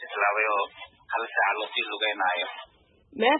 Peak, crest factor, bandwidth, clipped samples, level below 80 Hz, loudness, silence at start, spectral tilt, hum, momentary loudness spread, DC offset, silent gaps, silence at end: -8 dBFS; 20 dB; 4.1 kHz; under 0.1%; -72 dBFS; -26 LUFS; 0 s; -6.5 dB/octave; none; 13 LU; under 0.1%; none; 0 s